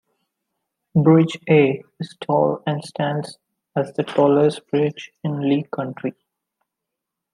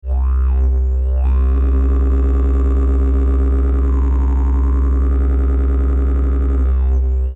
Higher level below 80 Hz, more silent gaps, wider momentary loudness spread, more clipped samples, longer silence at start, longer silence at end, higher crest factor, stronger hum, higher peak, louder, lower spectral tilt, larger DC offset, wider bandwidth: second, -68 dBFS vs -14 dBFS; neither; first, 14 LU vs 1 LU; neither; first, 0.95 s vs 0.05 s; first, 1.25 s vs 0 s; first, 18 dB vs 6 dB; neither; first, -2 dBFS vs -8 dBFS; second, -20 LUFS vs -17 LUFS; second, -8 dB/octave vs -11 dB/octave; neither; first, 11 kHz vs 2.6 kHz